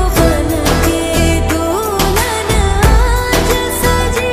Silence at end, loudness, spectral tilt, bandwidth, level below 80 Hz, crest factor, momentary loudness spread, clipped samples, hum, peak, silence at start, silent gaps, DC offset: 0 s; -13 LUFS; -4.5 dB/octave; 15.5 kHz; -16 dBFS; 12 dB; 3 LU; under 0.1%; none; 0 dBFS; 0 s; none; under 0.1%